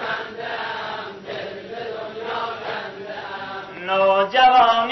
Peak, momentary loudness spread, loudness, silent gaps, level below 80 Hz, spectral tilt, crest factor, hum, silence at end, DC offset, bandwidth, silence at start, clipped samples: -6 dBFS; 17 LU; -21 LUFS; none; -60 dBFS; -4 dB/octave; 16 dB; none; 0 s; under 0.1%; 6.2 kHz; 0 s; under 0.1%